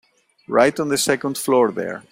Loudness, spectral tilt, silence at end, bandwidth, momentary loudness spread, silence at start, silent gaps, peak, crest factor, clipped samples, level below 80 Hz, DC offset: -19 LUFS; -3.5 dB/octave; 0.1 s; 16 kHz; 5 LU; 0.5 s; none; -2 dBFS; 18 dB; under 0.1%; -62 dBFS; under 0.1%